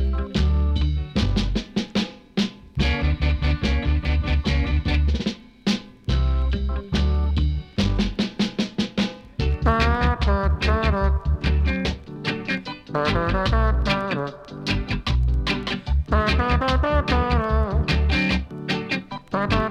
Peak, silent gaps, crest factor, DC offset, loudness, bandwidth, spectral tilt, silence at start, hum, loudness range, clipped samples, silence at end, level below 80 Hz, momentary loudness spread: -6 dBFS; none; 16 dB; under 0.1%; -23 LUFS; 8.2 kHz; -6.5 dB/octave; 0 s; none; 2 LU; under 0.1%; 0 s; -24 dBFS; 7 LU